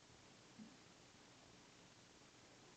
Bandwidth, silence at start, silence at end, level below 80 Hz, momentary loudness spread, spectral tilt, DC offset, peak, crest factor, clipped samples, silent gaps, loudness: 8.8 kHz; 0 s; 0 s; -84 dBFS; 3 LU; -3 dB/octave; under 0.1%; -48 dBFS; 16 dB; under 0.1%; none; -64 LUFS